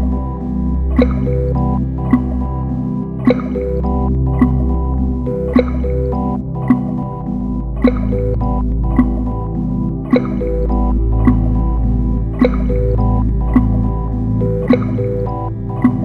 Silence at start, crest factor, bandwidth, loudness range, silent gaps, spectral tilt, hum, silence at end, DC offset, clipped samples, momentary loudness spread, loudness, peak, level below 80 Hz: 0 s; 14 dB; 4.4 kHz; 2 LU; none; -10.5 dB/octave; none; 0 s; under 0.1%; under 0.1%; 6 LU; -17 LUFS; 0 dBFS; -20 dBFS